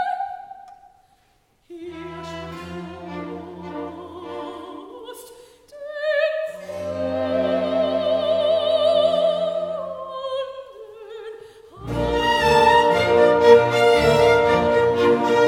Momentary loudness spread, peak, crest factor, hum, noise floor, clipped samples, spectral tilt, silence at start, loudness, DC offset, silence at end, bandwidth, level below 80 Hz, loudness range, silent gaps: 22 LU; 0 dBFS; 20 dB; none; -62 dBFS; under 0.1%; -5 dB/octave; 0 s; -19 LUFS; under 0.1%; 0 s; 15.5 kHz; -46 dBFS; 19 LU; none